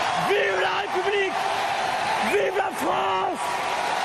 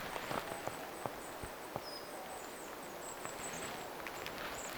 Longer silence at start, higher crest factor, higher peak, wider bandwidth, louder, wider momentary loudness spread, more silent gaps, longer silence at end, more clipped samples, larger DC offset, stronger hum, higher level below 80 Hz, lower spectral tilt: about the same, 0 s vs 0 s; second, 12 dB vs 24 dB; first, -12 dBFS vs -20 dBFS; second, 13.5 kHz vs over 20 kHz; first, -23 LUFS vs -44 LUFS; about the same, 3 LU vs 5 LU; neither; about the same, 0 s vs 0 s; neither; neither; neither; about the same, -62 dBFS vs -64 dBFS; about the same, -3 dB/octave vs -2.5 dB/octave